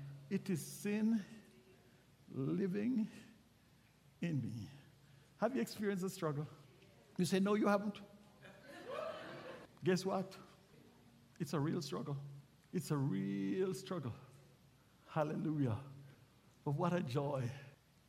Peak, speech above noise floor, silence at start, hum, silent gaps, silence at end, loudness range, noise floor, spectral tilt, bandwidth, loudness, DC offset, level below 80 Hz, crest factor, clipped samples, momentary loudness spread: -20 dBFS; 30 dB; 0 s; none; none; 0.35 s; 4 LU; -68 dBFS; -6.5 dB/octave; 16 kHz; -40 LUFS; under 0.1%; -76 dBFS; 20 dB; under 0.1%; 19 LU